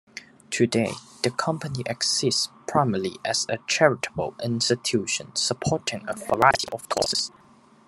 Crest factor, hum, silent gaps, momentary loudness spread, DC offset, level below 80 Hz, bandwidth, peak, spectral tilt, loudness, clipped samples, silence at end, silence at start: 24 dB; none; none; 9 LU; under 0.1%; -60 dBFS; 13 kHz; -2 dBFS; -3.5 dB/octave; -24 LUFS; under 0.1%; 0.6 s; 0.15 s